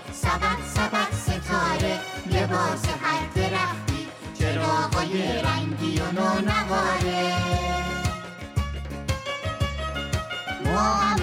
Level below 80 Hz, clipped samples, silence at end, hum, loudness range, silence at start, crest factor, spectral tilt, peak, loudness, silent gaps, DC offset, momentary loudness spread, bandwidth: -36 dBFS; under 0.1%; 0 s; none; 3 LU; 0 s; 14 dB; -5 dB/octave; -12 dBFS; -25 LUFS; none; under 0.1%; 7 LU; 16.5 kHz